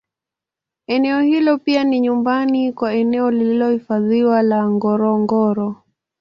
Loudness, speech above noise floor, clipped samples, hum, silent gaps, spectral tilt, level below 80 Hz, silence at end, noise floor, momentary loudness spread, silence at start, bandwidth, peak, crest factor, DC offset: -17 LUFS; 71 dB; under 0.1%; none; none; -8 dB/octave; -62 dBFS; 0.45 s; -87 dBFS; 4 LU; 0.9 s; 7 kHz; -4 dBFS; 14 dB; under 0.1%